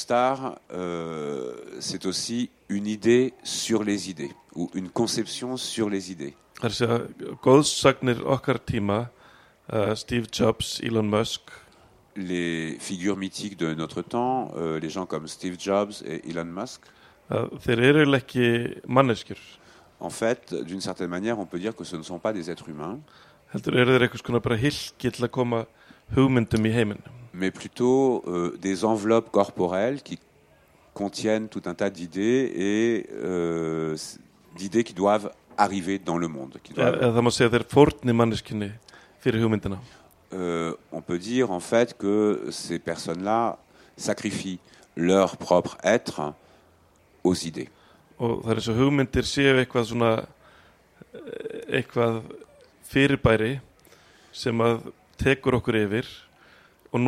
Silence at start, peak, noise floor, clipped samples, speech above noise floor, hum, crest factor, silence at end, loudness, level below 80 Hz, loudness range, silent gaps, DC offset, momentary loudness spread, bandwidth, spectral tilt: 0 s; -2 dBFS; -59 dBFS; under 0.1%; 34 dB; none; 22 dB; 0 s; -25 LUFS; -52 dBFS; 5 LU; none; under 0.1%; 15 LU; 15 kHz; -5.5 dB/octave